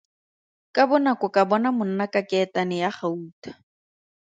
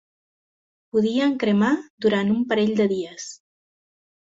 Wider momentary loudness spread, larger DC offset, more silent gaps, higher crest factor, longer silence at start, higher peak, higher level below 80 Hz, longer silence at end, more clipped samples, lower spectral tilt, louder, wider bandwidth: first, 14 LU vs 10 LU; neither; about the same, 3.33-3.42 s vs 1.90-1.98 s; about the same, 20 dB vs 16 dB; second, 0.75 s vs 0.95 s; first, -4 dBFS vs -8 dBFS; second, -74 dBFS vs -64 dBFS; about the same, 0.8 s vs 0.9 s; neither; about the same, -6.5 dB/octave vs -6 dB/octave; about the same, -23 LUFS vs -22 LUFS; first, 9 kHz vs 7.8 kHz